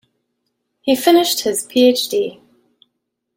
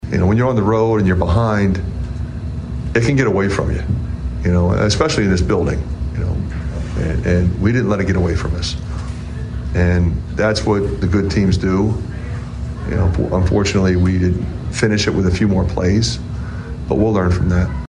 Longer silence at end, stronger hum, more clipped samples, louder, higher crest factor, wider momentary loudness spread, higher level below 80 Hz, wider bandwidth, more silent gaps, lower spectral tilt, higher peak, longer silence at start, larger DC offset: first, 1.05 s vs 0 s; first, 60 Hz at -45 dBFS vs none; neither; about the same, -16 LUFS vs -17 LUFS; about the same, 18 dB vs 14 dB; about the same, 10 LU vs 10 LU; second, -64 dBFS vs -26 dBFS; first, 16.5 kHz vs 10 kHz; neither; second, -2.5 dB/octave vs -6.5 dB/octave; about the same, -2 dBFS vs -2 dBFS; first, 0.85 s vs 0 s; neither